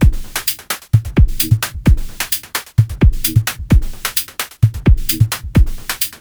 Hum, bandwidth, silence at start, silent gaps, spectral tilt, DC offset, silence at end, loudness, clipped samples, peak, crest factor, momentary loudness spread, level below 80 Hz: none; over 20 kHz; 0 s; none; -4.5 dB/octave; under 0.1%; 0.05 s; -16 LUFS; under 0.1%; 0 dBFS; 14 dB; 6 LU; -18 dBFS